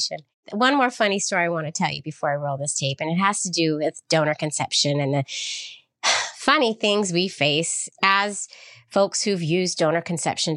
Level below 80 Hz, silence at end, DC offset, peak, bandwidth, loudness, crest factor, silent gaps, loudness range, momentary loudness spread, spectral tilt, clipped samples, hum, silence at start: -70 dBFS; 0 s; under 0.1%; -4 dBFS; 12 kHz; -22 LUFS; 20 dB; 0.34-0.43 s; 2 LU; 8 LU; -3.5 dB/octave; under 0.1%; none; 0 s